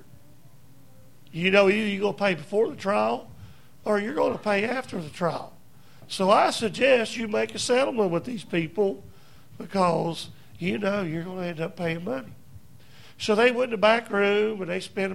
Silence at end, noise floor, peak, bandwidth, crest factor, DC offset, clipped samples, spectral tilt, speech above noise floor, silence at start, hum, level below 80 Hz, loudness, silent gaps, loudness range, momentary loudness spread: 0 s; -54 dBFS; -6 dBFS; 16 kHz; 20 dB; 0.4%; under 0.1%; -5 dB/octave; 30 dB; 1.35 s; none; -62 dBFS; -25 LUFS; none; 5 LU; 13 LU